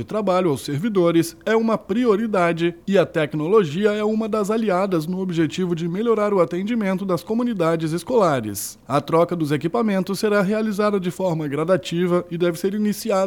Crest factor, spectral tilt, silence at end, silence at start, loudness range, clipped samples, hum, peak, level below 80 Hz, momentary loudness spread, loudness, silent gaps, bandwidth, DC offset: 16 dB; -6 dB/octave; 0 s; 0 s; 2 LU; under 0.1%; none; -4 dBFS; -58 dBFS; 5 LU; -21 LUFS; none; 18.5 kHz; under 0.1%